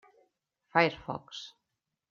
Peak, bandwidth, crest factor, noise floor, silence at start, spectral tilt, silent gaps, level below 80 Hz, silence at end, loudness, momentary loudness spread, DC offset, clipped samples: -10 dBFS; 7.4 kHz; 26 dB; -86 dBFS; 0.75 s; -5.5 dB/octave; none; -68 dBFS; 0.6 s; -30 LUFS; 17 LU; under 0.1%; under 0.1%